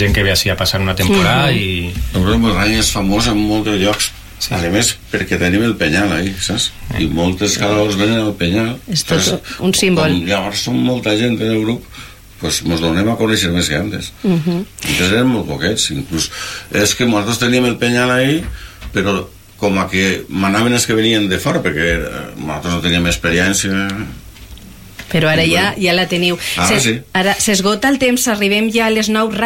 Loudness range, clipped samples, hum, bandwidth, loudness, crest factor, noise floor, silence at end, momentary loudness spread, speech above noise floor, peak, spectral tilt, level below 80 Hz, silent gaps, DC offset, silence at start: 3 LU; under 0.1%; none; 17 kHz; -15 LUFS; 12 dB; -35 dBFS; 0 s; 7 LU; 20 dB; -2 dBFS; -4 dB/octave; -32 dBFS; none; under 0.1%; 0 s